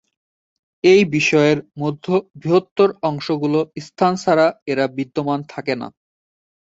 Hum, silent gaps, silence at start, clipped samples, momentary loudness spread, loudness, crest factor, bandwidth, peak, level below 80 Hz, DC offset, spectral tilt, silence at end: none; 2.71-2.76 s, 4.62-4.66 s; 0.85 s; under 0.1%; 11 LU; -18 LUFS; 18 dB; 8 kHz; -2 dBFS; -60 dBFS; under 0.1%; -6 dB/octave; 0.8 s